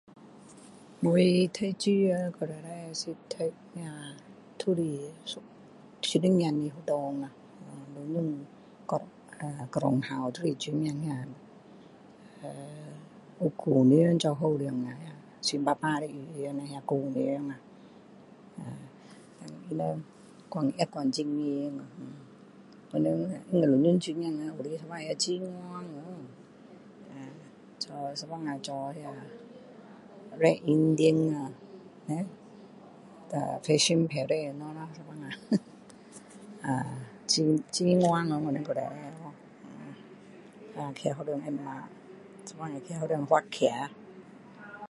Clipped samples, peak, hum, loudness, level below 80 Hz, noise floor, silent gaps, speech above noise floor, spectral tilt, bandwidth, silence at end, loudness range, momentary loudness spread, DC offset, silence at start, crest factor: under 0.1%; -8 dBFS; none; -30 LUFS; -74 dBFS; -53 dBFS; none; 23 dB; -5.5 dB/octave; 11.5 kHz; 0.05 s; 9 LU; 25 LU; under 0.1%; 0.15 s; 22 dB